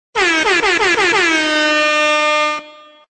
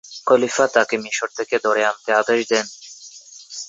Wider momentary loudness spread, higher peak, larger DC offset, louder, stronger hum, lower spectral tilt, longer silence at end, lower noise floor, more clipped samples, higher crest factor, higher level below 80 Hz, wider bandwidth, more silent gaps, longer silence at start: second, 3 LU vs 20 LU; about the same, -4 dBFS vs -2 dBFS; neither; first, -13 LUFS vs -19 LUFS; neither; about the same, -1 dB/octave vs -2 dB/octave; first, 0.4 s vs 0 s; second, -38 dBFS vs -42 dBFS; neither; second, 12 dB vs 18 dB; first, -50 dBFS vs -70 dBFS; first, 9.2 kHz vs 8 kHz; neither; about the same, 0.15 s vs 0.05 s